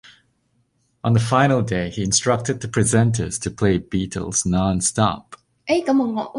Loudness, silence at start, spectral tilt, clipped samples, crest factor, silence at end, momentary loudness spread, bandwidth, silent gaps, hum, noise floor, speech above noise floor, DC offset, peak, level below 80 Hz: -20 LUFS; 1.05 s; -5 dB/octave; under 0.1%; 18 dB; 0 s; 8 LU; 11.5 kHz; none; none; -66 dBFS; 46 dB; under 0.1%; -2 dBFS; -42 dBFS